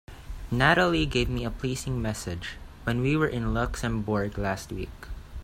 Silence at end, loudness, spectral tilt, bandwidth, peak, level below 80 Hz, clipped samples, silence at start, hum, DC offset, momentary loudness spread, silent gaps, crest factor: 0 s; -27 LUFS; -5.5 dB/octave; 16 kHz; -6 dBFS; -38 dBFS; under 0.1%; 0.1 s; none; under 0.1%; 17 LU; none; 20 dB